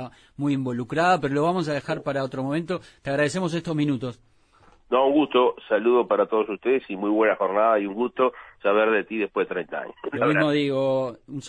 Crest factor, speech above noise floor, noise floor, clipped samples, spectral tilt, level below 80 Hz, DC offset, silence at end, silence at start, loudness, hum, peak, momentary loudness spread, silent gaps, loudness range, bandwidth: 16 dB; 33 dB; -56 dBFS; under 0.1%; -6.5 dB/octave; -62 dBFS; under 0.1%; 0 s; 0 s; -24 LUFS; none; -8 dBFS; 9 LU; none; 4 LU; 10.5 kHz